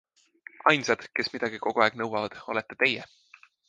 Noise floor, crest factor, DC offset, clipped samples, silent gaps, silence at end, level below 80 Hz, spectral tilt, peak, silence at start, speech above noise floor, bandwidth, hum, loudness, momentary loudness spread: -52 dBFS; 24 dB; under 0.1%; under 0.1%; none; 0.65 s; -72 dBFS; -4 dB/octave; -4 dBFS; 0.65 s; 25 dB; 9.6 kHz; none; -27 LUFS; 9 LU